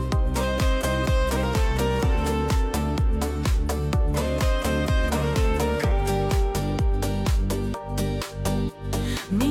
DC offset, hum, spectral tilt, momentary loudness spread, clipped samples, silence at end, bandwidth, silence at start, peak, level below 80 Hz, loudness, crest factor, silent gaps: under 0.1%; none; -6 dB/octave; 4 LU; under 0.1%; 0 s; 16 kHz; 0 s; -12 dBFS; -26 dBFS; -25 LUFS; 10 dB; none